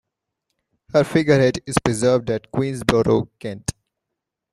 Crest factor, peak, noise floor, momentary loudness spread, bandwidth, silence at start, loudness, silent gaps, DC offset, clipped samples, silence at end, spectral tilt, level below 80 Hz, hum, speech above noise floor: 20 dB; 0 dBFS; -82 dBFS; 12 LU; 14 kHz; 0.95 s; -20 LUFS; none; under 0.1%; under 0.1%; 0.8 s; -5.5 dB/octave; -46 dBFS; none; 63 dB